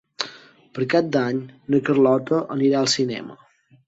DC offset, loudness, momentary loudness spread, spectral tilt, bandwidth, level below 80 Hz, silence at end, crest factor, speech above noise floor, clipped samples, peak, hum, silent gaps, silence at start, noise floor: under 0.1%; -21 LUFS; 13 LU; -5 dB/octave; 8 kHz; -66 dBFS; 0.55 s; 20 dB; 25 dB; under 0.1%; -2 dBFS; none; none; 0.2 s; -45 dBFS